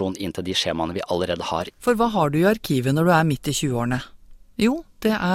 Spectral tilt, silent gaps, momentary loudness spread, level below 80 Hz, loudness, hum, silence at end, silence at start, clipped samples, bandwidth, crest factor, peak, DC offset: -5.5 dB/octave; none; 8 LU; -48 dBFS; -22 LUFS; none; 0 s; 0 s; under 0.1%; 16.5 kHz; 18 dB; -4 dBFS; under 0.1%